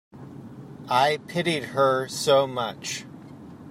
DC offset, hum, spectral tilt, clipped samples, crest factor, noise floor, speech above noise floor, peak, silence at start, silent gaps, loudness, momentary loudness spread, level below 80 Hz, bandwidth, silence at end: under 0.1%; none; -4 dB/octave; under 0.1%; 18 dB; -43 dBFS; 20 dB; -8 dBFS; 0.15 s; none; -24 LUFS; 22 LU; -68 dBFS; 16 kHz; 0 s